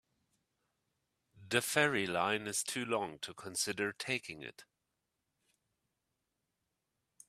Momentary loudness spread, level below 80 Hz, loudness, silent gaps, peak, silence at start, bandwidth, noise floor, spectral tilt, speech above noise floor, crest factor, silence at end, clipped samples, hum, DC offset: 14 LU; -78 dBFS; -35 LUFS; none; -12 dBFS; 1.35 s; 15 kHz; -86 dBFS; -2.5 dB/octave; 50 dB; 28 dB; 2.65 s; under 0.1%; none; under 0.1%